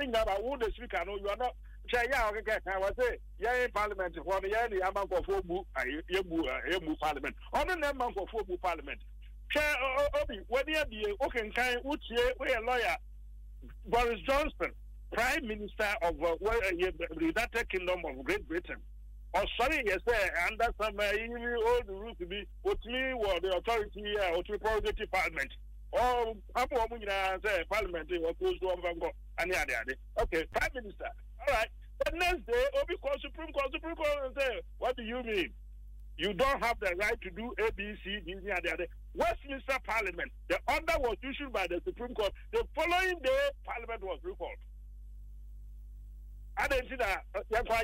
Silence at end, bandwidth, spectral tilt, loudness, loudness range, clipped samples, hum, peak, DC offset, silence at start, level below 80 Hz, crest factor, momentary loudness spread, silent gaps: 0 s; 16 kHz; -4 dB/octave; -33 LUFS; 2 LU; under 0.1%; none; -18 dBFS; under 0.1%; 0 s; -46 dBFS; 16 dB; 11 LU; none